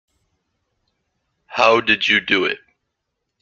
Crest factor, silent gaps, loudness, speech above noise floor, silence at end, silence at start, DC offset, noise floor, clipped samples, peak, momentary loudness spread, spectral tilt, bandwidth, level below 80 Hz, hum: 20 dB; none; -16 LUFS; 60 dB; 0.85 s; 1.5 s; under 0.1%; -77 dBFS; under 0.1%; -2 dBFS; 13 LU; -3.5 dB/octave; 7.6 kHz; -62 dBFS; none